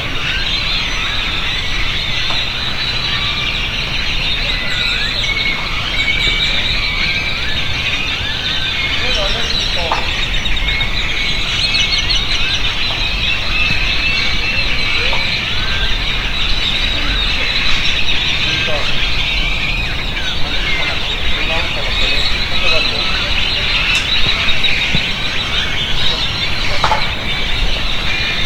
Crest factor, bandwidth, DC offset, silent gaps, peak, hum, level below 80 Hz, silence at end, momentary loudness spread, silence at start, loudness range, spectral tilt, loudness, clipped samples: 14 dB; 15.5 kHz; under 0.1%; none; 0 dBFS; none; -22 dBFS; 0 s; 4 LU; 0 s; 2 LU; -2.5 dB/octave; -15 LUFS; under 0.1%